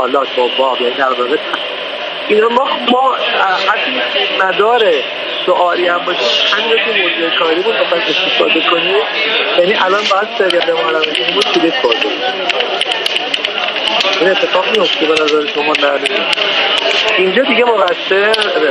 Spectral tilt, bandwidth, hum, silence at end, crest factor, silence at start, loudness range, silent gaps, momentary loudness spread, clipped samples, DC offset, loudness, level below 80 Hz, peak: -2.5 dB/octave; 12 kHz; none; 0 s; 12 dB; 0 s; 2 LU; none; 4 LU; under 0.1%; under 0.1%; -12 LUFS; -60 dBFS; 0 dBFS